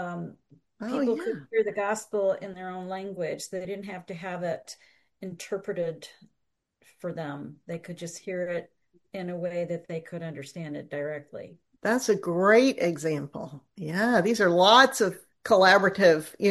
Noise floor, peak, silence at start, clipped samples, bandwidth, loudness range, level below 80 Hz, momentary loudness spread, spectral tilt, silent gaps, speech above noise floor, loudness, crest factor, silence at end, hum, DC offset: -78 dBFS; -4 dBFS; 0 s; under 0.1%; 12.5 kHz; 15 LU; -72 dBFS; 20 LU; -4.5 dB/octave; none; 52 dB; -25 LUFS; 22 dB; 0 s; none; under 0.1%